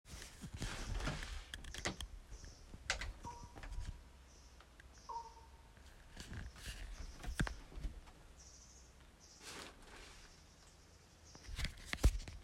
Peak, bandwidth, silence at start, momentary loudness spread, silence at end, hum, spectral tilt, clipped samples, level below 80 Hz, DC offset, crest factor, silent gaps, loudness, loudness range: -20 dBFS; 16 kHz; 0.05 s; 19 LU; 0 s; none; -4 dB/octave; under 0.1%; -48 dBFS; under 0.1%; 28 dB; none; -47 LUFS; 9 LU